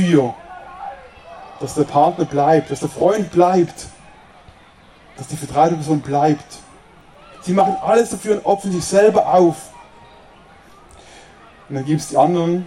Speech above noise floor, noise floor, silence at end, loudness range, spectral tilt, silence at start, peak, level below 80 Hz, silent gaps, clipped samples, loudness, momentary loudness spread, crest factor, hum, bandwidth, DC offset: 31 dB; -47 dBFS; 0 s; 5 LU; -6 dB/octave; 0 s; -2 dBFS; -52 dBFS; none; under 0.1%; -17 LUFS; 21 LU; 18 dB; none; 13.5 kHz; under 0.1%